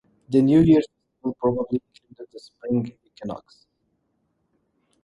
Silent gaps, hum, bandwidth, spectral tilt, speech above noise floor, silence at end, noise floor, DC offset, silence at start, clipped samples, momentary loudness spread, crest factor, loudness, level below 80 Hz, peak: none; none; 11 kHz; -9 dB/octave; 50 dB; 1.65 s; -72 dBFS; under 0.1%; 0.3 s; under 0.1%; 22 LU; 18 dB; -21 LUFS; -52 dBFS; -6 dBFS